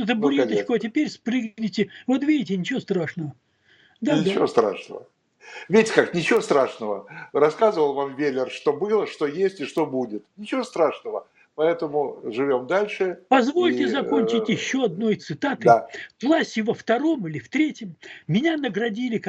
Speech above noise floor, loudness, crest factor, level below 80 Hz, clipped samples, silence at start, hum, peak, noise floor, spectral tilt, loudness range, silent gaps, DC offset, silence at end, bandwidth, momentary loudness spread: 36 dB; -23 LUFS; 22 dB; -70 dBFS; under 0.1%; 0 s; none; 0 dBFS; -59 dBFS; -5.5 dB/octave; 4 LU; none; under 0.1%; 0 s; 10.5 kHz; 11 LU